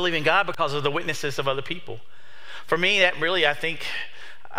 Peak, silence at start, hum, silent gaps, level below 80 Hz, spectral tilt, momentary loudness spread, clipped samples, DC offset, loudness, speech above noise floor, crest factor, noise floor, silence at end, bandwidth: -4 dBFS; 0 s; none; none; -62 dBFS; -3.5 dB/octave; 22 LU; under 0.1%; 3%; -23 LUFS; 20 dB; 22 dB; -44 dBFS; 0 s; 16 kHz